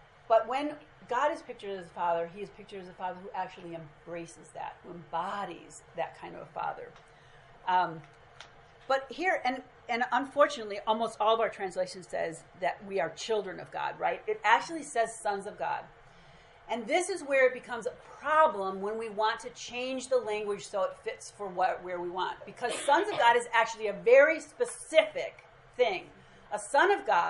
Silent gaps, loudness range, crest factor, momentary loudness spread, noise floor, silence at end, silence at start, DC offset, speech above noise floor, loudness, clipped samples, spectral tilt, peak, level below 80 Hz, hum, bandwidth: none; 12 LU; 24 dB; 17 LU; -56 dBFS; 0 s; 0.3 s; under 0.1%; 25 dB; -30 LUFS; under 0.1%; -3 dB/octave; -6 dBFS; -68 dBFS; none; 11.5 kHz